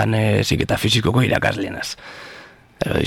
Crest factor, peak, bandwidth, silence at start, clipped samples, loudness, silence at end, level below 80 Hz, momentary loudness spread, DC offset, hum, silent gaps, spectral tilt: 18 dB; -2 dBFS; 17 kHz; 0 s; under 0.1%; -19 LUFS; 0 s; -40 dBFS; 18 LU; under 0.1%; none; none; -5 dB/octave